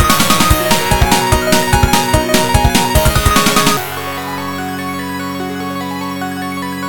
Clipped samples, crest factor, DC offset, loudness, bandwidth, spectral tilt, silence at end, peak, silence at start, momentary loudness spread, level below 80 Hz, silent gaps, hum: 0.1%; 14 dB; 3%; -13 LUFS; 18.5 kHz; -3.5 dB/octave; 0 s; 0 dBFS; 0 s; 10 LU; -22 dBFS; none; none